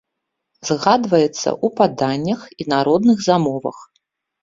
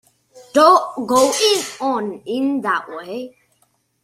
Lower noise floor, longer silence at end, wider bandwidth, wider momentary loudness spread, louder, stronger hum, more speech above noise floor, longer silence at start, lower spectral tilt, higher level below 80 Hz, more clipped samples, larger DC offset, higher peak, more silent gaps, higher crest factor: first, -78 dBFS vs -63 dBFS; second, 0.6 s vs 0.75 s; second, 7.6 kHz vs 16 kHz; second, 10 LU vs 17 LU; about the same, -18 LUFS vs -17 LUFS; neither; first, 61 dB vs 46 dB; first, 0.65 s vs 0.35 s; first, -5.5 dB/octave vs -2.5 dB/octave; first, -58 dBFS vs -64 dBFS; neither; neither; about the same, 0 dBFS vs 0 dBFS; neither; about the same, 18 dB vs 18 dB